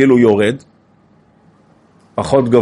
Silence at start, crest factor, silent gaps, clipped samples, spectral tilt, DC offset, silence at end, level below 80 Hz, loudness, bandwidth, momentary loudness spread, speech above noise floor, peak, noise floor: 0 s; 14 dB; none; under 0.1%; -7 dB/octave; under 0.1%; 0 s; -50 dBFS; -14 LUFS; 11.5 kHz; 16 LU; 39 dB; 0 dBFS; -51 dBFS